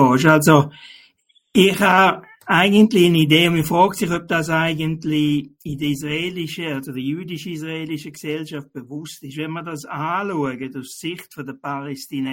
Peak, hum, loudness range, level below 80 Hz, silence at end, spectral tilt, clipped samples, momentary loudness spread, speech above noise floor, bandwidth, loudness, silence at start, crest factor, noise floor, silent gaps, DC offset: 0 dBFS; none; 12 LU; -54 dBFS; 0 s; -5.5 dB/octave; under 0.1%; 17 LU; 39 dB; 17 kHz; -18 LUFS; 0 s; 18 dB; -58 dBFS; none; under 0.1%